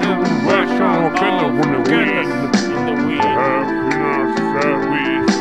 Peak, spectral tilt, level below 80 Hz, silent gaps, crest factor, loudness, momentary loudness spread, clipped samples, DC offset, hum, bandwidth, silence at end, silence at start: -2 dBFS; -5.5 dB/octave; -50 dBFS; none; 14 dB; -16 LUFS; 3 LU; under 0.1%; 0.6%; none; 11.5 kHz; 0 s; 0 s